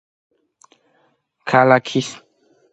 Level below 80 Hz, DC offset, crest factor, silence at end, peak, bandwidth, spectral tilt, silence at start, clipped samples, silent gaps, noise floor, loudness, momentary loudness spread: -66 dBFS; under 0.1%; 20 dB; 0.55 s; 0 dBFS; 9 kHz; -5.5 dB/octave; 1.45 s; under 0.1%; none; -63 dBFS; -17 LUFS; 19 LU